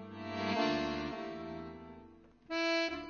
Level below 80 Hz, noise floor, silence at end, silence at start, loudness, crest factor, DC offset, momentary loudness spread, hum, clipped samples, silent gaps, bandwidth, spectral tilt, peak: -62 dBFS; -59 dBFS; 0 s; 0 s; -36 LUFS; 16 dB; under 0.1%; 18 LU; none; under 0.1%; none; 6.8 kHz; -2.5 dB/octave; -22 dBFS